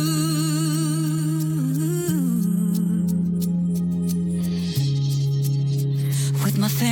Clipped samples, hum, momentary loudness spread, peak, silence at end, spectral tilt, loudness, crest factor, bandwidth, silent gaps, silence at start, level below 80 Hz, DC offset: under 0.1%; none; 2 LU; -10 dBFS; 0 s; -6 dB/octave; -22 LUFS; 12 dB; 17.5 kHz; none; 0 s; -52 dBFS; under 0.1%